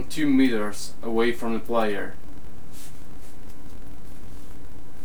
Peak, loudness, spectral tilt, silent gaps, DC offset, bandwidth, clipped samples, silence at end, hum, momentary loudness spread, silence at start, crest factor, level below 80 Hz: -8 dBFS; -25 LUFS; -5 dB/octave; none; 8%; over 20 kHz; under 0.1%; 0 s; none; 25 LU; 0 s; 18 dB; -46 dBFS